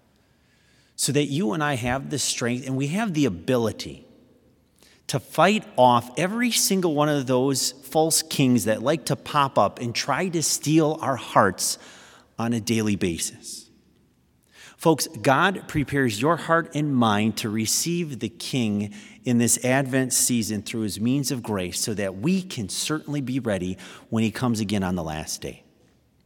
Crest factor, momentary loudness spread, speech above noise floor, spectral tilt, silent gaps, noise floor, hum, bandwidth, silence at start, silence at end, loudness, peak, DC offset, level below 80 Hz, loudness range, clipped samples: 22 dB; 10 LU; 39 dB; -4 dB/octave; none; -62 dBFS; none; 18 kHz; 1 s; 0.7 s; -23 LUFS; -2 dBFS; under 0.1%; -58 dBFS; 5 LU; under 0.1%